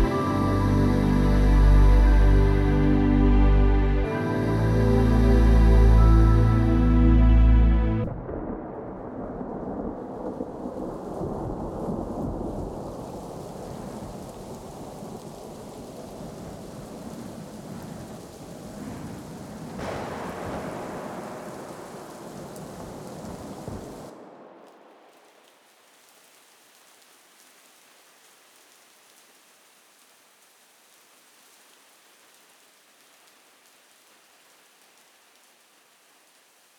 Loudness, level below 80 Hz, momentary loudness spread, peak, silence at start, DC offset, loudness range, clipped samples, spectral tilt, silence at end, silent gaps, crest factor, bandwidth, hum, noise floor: -23 LUFS; -26 dBFS; 21 LU; -8 dBFS; 0 s; under 0.1%; 20 LU; under 0.1%; -8 dB/octave; 12.55 s; none; 18 dB; 11.5 kHz; none; -59 dBFS